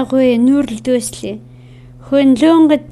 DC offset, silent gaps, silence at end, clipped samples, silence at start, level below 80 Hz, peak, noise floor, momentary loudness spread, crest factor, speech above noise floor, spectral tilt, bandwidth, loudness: under 0.1%; none; 0 s; under 0.1%; 0 s; -46 dBFS; 0 dBFS; -38 dBFS; 16 LU; 12 dB; 26 dB; -5 dB/octave; 13 kHz; -12 LUFS